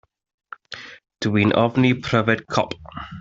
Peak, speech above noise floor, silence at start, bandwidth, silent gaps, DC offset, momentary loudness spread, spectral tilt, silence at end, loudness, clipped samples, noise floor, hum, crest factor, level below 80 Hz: -2 dBFS; 20 dB; 0.7 s; 7.8 kHz; none; under 0.1%; 19 LU; -6.5 dB/octave; 0 s; -20 LUFS; under 0.1%; -40 dBFS; none; 20 dB; -52 dBFS